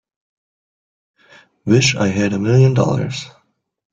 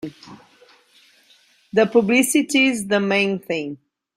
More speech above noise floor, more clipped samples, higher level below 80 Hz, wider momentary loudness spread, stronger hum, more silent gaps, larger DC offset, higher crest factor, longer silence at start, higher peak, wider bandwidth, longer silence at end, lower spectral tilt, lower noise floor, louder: first, 47 dB vs 37 dB; neither; first, -52 dBFS vs -64 dBFS; about the same, 16 LU vs 14 LU; neither; neither; neither; about the same, 16 dB vs 18 dB; first, 1.65 s vs 0.05 s; about the same, -2 dBFS vs -4 dBFS; second, 8 kHz vs 16 kHz; first, 0.65 s vs 0.4 s; first, -5.5 dB/octave vs -4 dB/octave; first, -63 dBFS vs -56 dBFS; first, -15 LUFS vs -18 LUFS